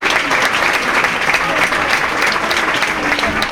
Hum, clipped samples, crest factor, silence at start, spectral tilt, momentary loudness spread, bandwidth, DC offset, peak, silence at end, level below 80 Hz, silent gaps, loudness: none; under 0.1%; 14 dB; 0 s; -2 dB/octave; 2 LU; 19 kHz; under 0.1%; 0 dBFS; 0 s; -40 dBFS; none; -14 LUFS